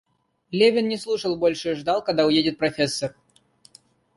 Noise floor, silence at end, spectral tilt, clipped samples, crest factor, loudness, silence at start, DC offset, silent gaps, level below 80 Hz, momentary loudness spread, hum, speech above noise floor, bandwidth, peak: -58 dBFS; 1.05 s; -4.5 dB/octave; under 0.1%; 18 dB; -22 LUFS; 0.5 s; under 0.1%; none; -60 dBFS; 8 LU; none; 36 dB; 11.5 kHz; -6 dBFS